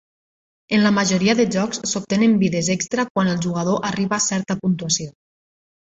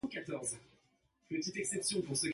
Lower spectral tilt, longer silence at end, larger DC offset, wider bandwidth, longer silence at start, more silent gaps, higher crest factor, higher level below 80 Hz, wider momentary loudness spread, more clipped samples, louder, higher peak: first, -4.5 dB/octave vs -3 dB/octave; first, 0.8 s vs 0 s; neither; second, 8 kHz vs 12 kHz; first, 0.7 s vs 0.05 s; first, 3.10-3.15 s vs none; about the same, 18 dB vs 16 dB; first, -56 dBFS vs -72 dBFS; about the same, 6 LU vs 7 LU; neither; first, -20 LUFS vs -38 LUFS; first, -4 dBFS vs -22 dBFS